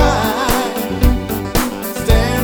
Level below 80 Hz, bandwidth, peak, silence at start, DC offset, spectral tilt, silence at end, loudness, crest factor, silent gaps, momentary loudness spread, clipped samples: -20 dBFS; over 20 kHz; 0 dBFS; 0 s; under 0.1%; -5 dB/octave; 0 s; -17 LUFS; 14 dB; none; 6 LU; under 0.1%